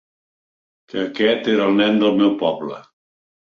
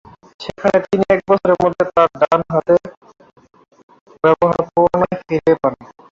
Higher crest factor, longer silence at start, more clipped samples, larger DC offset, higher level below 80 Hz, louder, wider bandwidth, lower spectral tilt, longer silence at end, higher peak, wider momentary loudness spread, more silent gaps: about the same, 16 dB vs 16 dB; first, 0.95 s vs 0.4 s; neither; neither; second, -62 dBFS vs -50 dBFS; about the same, -18 LUFS vs -16 LUFS; about the same, 6.8 kHz vs 7.4 kHz; about the same, -6.5 dB/octave vs -7.5 dB/octave; first, 0.6 s vs 0.3 s; about the same, -4 dBFS vs -2 dBFS; first, 14 LU vs 5 LU; second, none vs 2.97-3.01 s, 3.83-3.88 s, 4.01-4.06 s